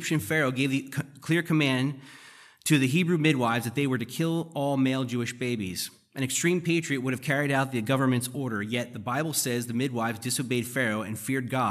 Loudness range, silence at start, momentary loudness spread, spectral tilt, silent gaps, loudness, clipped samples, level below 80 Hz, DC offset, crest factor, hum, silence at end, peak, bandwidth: 2 LU; 0 s; 8 LU; -5 dB/octave; none; -27 LUFS; under 0.1%; -70 dBFS; under 0.1%; 18 dB; none; 0 s; -8 dBFS; 15 kHz